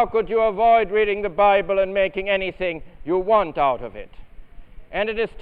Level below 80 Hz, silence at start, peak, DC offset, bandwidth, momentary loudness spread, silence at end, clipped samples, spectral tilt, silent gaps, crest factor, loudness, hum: -42 dBFS; 0 s; -6 dBFS; 0.1%; 4.7 kHz; 12 LU; 0 s; under 0.1%; -7.5 dB/octave; none; 16 dB; -20 LUFS; none